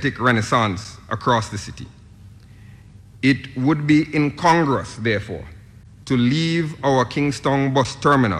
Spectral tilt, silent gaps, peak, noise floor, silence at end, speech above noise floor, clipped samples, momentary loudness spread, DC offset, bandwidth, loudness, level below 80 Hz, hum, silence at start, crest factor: -6 dB/octave; none; -6 dBFS; -44 dBFS; 0 s; 24 dB; under 0.1%; 15 LU; under 0.1%; 12 kHz; -19 LUFS; -48 dBFS; none; 0 s; 14 dB